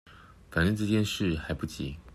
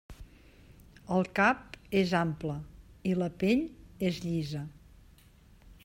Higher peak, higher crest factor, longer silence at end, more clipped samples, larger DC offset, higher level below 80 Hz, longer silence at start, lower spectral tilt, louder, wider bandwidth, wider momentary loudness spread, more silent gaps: about the same, -12 dBFS vs -12 dBFS; about the same, 18 dB vs 22 dB; about the same, 0 s vs 0.1 s; neither; neither; first, -48 dBFS vs -56 dBFS; about the same, 0.1 s vs 0.1 s; about the same, -5.5 dB/octave vs -6.5 dB/octave; about the same, -30 LUFS vs -31 LUFS; second, 14.5 kHz vs 16 kHz; second, 9 LU vs 14 LU; neither